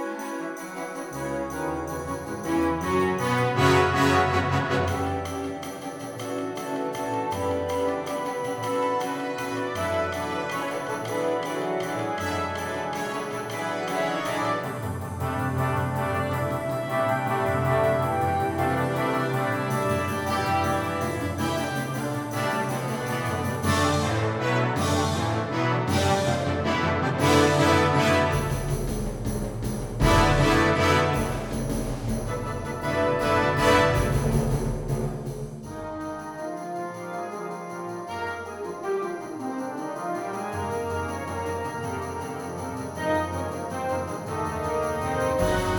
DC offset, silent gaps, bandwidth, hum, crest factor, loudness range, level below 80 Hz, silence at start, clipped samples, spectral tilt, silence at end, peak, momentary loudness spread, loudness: under 0.1%; none; over 20 kHz; none; 20 dB; 8 LU; -42 dBFS; 0 s; under 0.1%; -5.5 dB/octave; 0 s; -6 dBFS; 12 LU; -26 LUFS